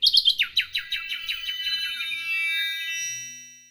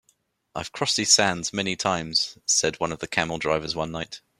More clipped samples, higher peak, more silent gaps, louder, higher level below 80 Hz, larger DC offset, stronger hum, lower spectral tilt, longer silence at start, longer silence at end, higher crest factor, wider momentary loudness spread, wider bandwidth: neither; about the same, -6 dBFS vs -4 dBFS; neither; about the same, -24 LUFS vs -23 LUFS; second, -62 dBFS vs -56 dBFS; neither; neither; second, 4 dB/octave vs -2 dB/octave; second, 0 s vs 0.55 s; about the same, 0.1 s vs 0.2 s; about the same, 20 dB vs 22 dB; second, 11 LU vs 14 LU; first, over 20 kHz vs 15.5 kHz